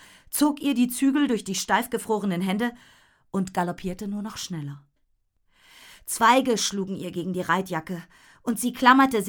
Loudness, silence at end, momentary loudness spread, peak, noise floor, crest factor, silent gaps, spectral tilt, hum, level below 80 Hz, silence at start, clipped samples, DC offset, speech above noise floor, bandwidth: -24 LUFS; 0 s; 14 LU; -4 dBFS; -69 dBFS; 22 dB; none; -4 dB/octave; none; -58 dBFS; 0.3 s; under 0.1%; under 0.1%; 45 dB; over 20 kHz